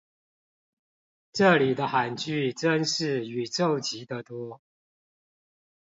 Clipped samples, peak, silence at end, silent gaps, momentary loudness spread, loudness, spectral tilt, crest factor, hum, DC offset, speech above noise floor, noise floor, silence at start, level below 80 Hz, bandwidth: under 0.1%; -8 dBFS; 1.3 s; none; 16 LU; -26 LUFS; -4.5 dB/octave; 22 dB; none; under 0.1%; over 64 dB; under -90 dBFS; 1.35 s; -72 dBFS; 7.8 kHz